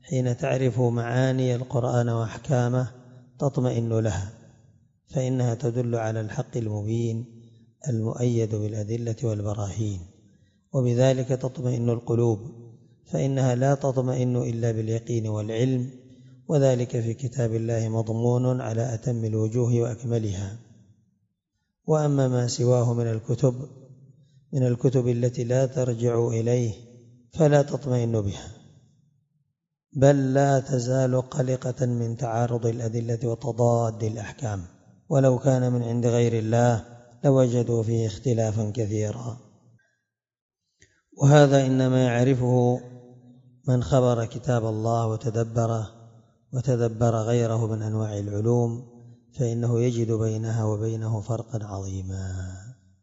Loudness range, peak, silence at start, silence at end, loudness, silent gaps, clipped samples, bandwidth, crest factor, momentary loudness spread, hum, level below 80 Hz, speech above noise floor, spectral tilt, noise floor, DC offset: 5 LU; -4 dBFS; 0.05 s; 0.3 s; -25 LUFS; 40.41-40.49 s; under 0.1%; 7.8 kHz; 20 dB; 11 LU; none; -58 dBFS; 56 dB; -7.5 dB/octave; -79 dBFS; under 0.1%